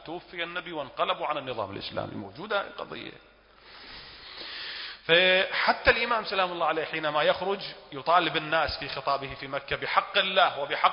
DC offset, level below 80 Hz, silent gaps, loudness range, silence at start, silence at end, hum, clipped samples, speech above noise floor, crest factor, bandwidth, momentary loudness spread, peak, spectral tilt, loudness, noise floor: under 0.1%; -54 dBFS; none; 11 LU; 0 s; 0 s; none; under 0.1%; 25 dB; 22 dB; 5.4 kHz; 16 LU; -6 dBFS; -7.5 dB/octave; -27 LUFS; -53 dBFS